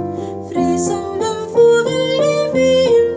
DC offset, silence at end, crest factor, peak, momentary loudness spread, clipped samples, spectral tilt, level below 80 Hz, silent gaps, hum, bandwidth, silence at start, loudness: under 0.1%; 0 s; 12 dB; -2 dBFS; 9 LU; under 0.1%; -5 dB/octave; -46 dBFS; none; none; 8 kHz; 0 s; -15 LUFS